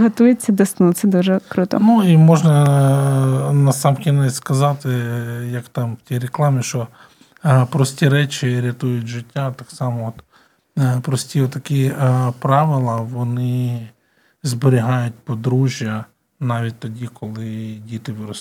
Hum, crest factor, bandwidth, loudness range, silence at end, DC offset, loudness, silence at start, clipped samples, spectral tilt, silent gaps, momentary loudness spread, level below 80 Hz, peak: none; 16 dB; 15.5 kHz; 8 LU; 0 s; under 0.1%; -17 LUFS; 0 s; under 0.1%; -7 dB/octave; none; 14 LU; -62 dBFS; 0 dBFS